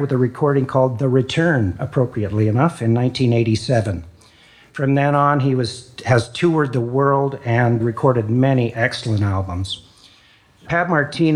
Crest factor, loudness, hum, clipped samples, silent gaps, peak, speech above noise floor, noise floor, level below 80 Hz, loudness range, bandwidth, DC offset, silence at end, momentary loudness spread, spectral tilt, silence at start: 16 dB; -18 LUFS; none; under 0.1%; none; -2 dBFS; 34 dB; -52 dBFS; -52 dBFS; 2 LU; 10.5 kHz; under 0.1%; 0 s; 7 LU; -7 dB/octave; 0 s